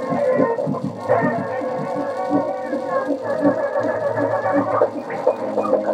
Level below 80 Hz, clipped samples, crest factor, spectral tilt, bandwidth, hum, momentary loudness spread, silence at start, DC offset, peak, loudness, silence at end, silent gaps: -72 dBFS; under 0.1%; 18 dB; -8 dB/octave; 10 kHz; none; 5 LU; 0 s; under 0.1%; -2 dBFS; -21 LUFS; 0 s; none